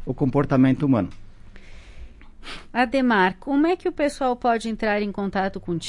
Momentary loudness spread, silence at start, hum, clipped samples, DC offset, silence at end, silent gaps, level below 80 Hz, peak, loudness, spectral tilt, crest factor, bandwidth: 9 LU; 0 s; none; under 0.1%; under 0.1%; 0 s; none; -44 dBFS; -6 dBFS; -22 LUFS; -6.5 dB/octave; 16 dB; 11.5 kHz